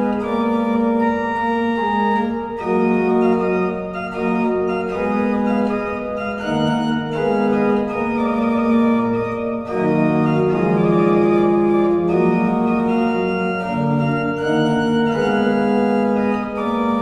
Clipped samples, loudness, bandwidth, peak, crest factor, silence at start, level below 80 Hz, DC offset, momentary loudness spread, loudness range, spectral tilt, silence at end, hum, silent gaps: under 0.1%; -18 LUFS; 9.4 kHz; -4 dBFS; 14 dB; 0 s; -48 dBFS; under 0.1%; 6 LU; 3 LU; -8 dB/octave; 0 s; none; none